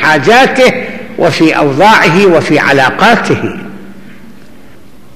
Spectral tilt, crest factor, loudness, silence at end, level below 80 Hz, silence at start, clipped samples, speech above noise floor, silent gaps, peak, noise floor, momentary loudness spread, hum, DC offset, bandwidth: -5 dB/octave; 10 dB; -7 LUFS; 1.15 s; -42 dBFS; 0 s; under 0.1%; 31 dB; none; 0 dBFS; -38 dBFS; 14 LU; none; 3%; 15.5 kHz